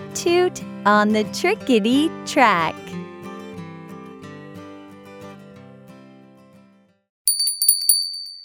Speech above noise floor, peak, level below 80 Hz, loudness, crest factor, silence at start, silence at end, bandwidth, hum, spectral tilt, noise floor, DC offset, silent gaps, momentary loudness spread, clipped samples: 36 dB; 0 dBFS; -68 dBFS; -18 LUFS; 22 dB; 0 s; 0 s; over 20 kHz; none; -2.5 dB/octave; -55 dBFS; under 0.1%; 7.09-7.25 s; 23 LU; under 0.1%